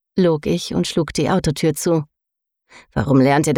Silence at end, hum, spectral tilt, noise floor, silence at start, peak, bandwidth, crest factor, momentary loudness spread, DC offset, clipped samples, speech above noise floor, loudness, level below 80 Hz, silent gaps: 0 s; none; -5.5 dB/octave; -81 dBFS; 0.15 s; -4 dBFS; 17 kHz; 14 dB; 8 LU; under 0.1%; under 0.1%; 64 dB; -19 LUFS; -42 dBFS; none